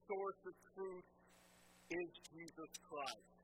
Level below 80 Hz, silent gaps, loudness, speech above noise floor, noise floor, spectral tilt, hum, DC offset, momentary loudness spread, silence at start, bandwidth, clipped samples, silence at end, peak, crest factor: -82 dBFS; none; -50 LUFS; 17 dB; -69 dBFS; -3.5 dB/octave; 60 Hz at -75 dBFS; under 0.1%; 21 LU; 0.05 s; 16 kHz; under 0.1%; 0 s; -28 dBFS; 22 dB